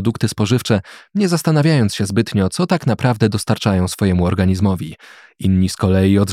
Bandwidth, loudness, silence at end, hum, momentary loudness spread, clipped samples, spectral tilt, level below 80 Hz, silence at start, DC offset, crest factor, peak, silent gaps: 15 kHz; -17 LUFS; 0 s; none; 5 LU; under 0.1%; -6.5 dB/octave; -50 dBFS; 0 s; under 0.1%; 14 dB; -2 dBFS; none